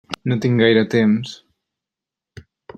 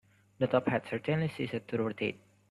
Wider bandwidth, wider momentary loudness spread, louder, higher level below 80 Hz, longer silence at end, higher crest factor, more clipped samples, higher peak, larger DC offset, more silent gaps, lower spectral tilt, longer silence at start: second, 8.8 kHz vs 12 kHz; about the same, 8 LU vs 7 LU; first, -17 LUFS vs -33 LUFS; first, -60 dBFS vs -68 dBFS; about the same, 0.35 s vs 0.35 s; about the same, 18 dB vs 20 dB; neither; first, -2 dBFS vs -14 dBFS; neither; neither; about the same, -7 dB/octave vs -7.5 dB/octave; second, 0.1 s vs 0.4 s